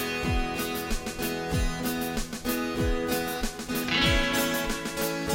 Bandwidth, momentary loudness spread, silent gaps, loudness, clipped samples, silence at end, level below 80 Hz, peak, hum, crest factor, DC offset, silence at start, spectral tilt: 16.5 kHz; 8 LU; none; -28 LUFS; under 0.1%; 0 s; -36 dBFS; -10 dBFS; none; 18 dB; under 0.1%; 0 s; -4 dB/octave